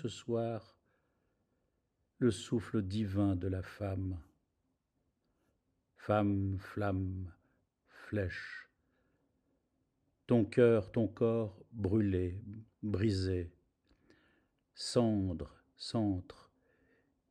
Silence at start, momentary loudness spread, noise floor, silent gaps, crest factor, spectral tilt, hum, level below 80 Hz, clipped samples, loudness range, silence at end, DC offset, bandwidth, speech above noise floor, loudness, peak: 0 s; 14 LU; -82 dBFS; none; 22 dB; -7 dB/octave; none; -68 dBFS; under 0.1%; 7 LU; 1 s; under 0.1%; 10.5 kHz; 48 dB; -35 LUFS; -16 dBFS